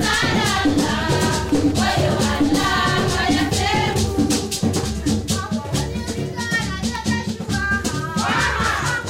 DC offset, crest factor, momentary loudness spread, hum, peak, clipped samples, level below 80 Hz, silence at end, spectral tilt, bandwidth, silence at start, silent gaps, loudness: under 0.1%; 12 dB; 6 LU; none; -8 dBFS; under 0.1%; -34 dBFS; 0 s; -4 dB/octave; 16 kHz; 0 s; none; -20 LUFS